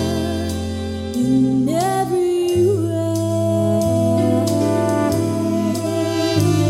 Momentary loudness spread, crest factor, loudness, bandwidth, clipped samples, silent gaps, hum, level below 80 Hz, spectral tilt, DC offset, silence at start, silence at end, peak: 5 LU; 14 dB; -18 LUFS; 16 kHz; under 0.1%; none; none; -42 dBFS; -6.5 dB/octave; under 0.1%; 0 s; 0 s; -4 dBFS